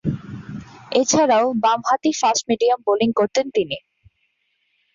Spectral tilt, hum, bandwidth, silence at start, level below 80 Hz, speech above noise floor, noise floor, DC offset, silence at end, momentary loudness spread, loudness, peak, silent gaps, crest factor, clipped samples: -4 dB/octave; none; 7.6 kHz; 0.05 s; -54 dBFS; 50 dB; -69 dBFS; under 0.1%; 1.15 s; 16 LU; -19 LUFS; -4 dBFS; none; 16 dB; under 0.1%